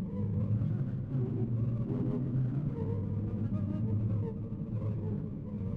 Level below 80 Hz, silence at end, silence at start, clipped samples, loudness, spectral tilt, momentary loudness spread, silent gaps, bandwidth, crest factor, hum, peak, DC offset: -50 dBFS; 0 s; 0 s; under 0.1%; -34 LUFS; -12 dB/octave; 5 LU; none; 3.2 kHz; 12 dB; none; -22 dBFS; under 0.1%